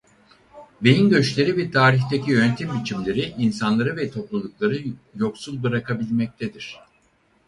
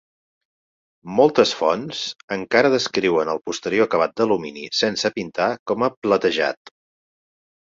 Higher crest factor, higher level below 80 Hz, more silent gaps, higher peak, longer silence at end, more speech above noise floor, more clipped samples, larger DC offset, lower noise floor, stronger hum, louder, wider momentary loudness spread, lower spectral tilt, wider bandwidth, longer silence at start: about the same, 20 dB vs 20 dB; first, -56 dBFS vs -62 dBFS; second, none vs 2.23-2.28 s, 5.59-5.66 s, 5.97-6.02 s; about the same, -2 dBFS vs -2 dBFS; second, 0.7 s vs 1.2 s; second, 41 dB vs over 70 dB; neither; neither; second, -62 dBFS vs under -90 dBFS; neither; about the same, -22 LUFS vs -20 LUFS; first, 12 LU vs 8 LU; first, -6.5 dB/octave vs -4 dB/octave; first, 11.5 kHz vs 7.8 kHz; second, 0.55 s vs 1.05 s